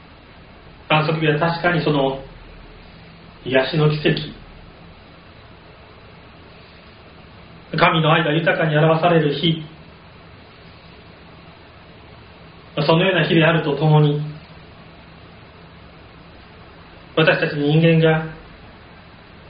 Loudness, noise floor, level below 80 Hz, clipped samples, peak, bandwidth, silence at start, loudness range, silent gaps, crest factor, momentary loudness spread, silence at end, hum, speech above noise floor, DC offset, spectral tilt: -17 LUFS; -44 dBFS; -50 dBFS; under 0.1%; 0 dBFS; 5.2 kHz; 0.65 s; 8 LU; none; 20 dB; 17 LU; 0.8 s; none; 27 dB; under 0.1%; -4.5 dB/octave